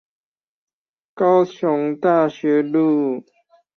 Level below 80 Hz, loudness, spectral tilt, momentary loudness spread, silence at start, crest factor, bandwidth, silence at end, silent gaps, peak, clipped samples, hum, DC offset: -68 dBFS; -18 LUFS; -8 dB/octave; 5 LU; 1.15 s; 16 dB; 6.6 kHz; 0.55 s; none; -4 dBFS; under 0.1%; none; under 0.1%